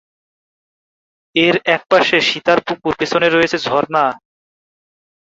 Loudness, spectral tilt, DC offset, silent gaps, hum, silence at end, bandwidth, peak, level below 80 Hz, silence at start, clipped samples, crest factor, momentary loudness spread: -15 LUFS; -4 dB/octave; under 0.1%; none; none; 1.2 s; 7.8 kHz; 0 dBFS; -56 dBFS; 1.35 s; under 0.1%; 18 dB; 7 LU